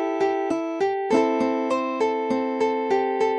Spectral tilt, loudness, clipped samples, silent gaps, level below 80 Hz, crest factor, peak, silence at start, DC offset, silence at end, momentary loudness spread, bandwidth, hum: -5 dB/octave; -23 LUFS; under 0.1%; none; -66 dBFS; 16 dB; -8 dBFS; 0 s; under 0.1%; 0 s; 3 LU; 10 kHz; none